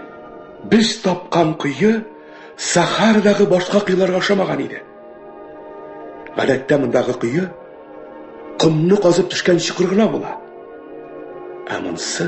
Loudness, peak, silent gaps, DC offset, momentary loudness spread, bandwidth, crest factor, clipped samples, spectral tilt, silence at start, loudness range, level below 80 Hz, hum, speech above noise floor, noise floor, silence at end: -17 LUFS; 0 dBFS; none; under 0.1%; 23 LU; 8.6 kHz; 18 dB; under 0.1%; -5 dB/octave; 0 s; 5 LU; -56 dBFS; none; 22 dB; -38 dBFS; 0 s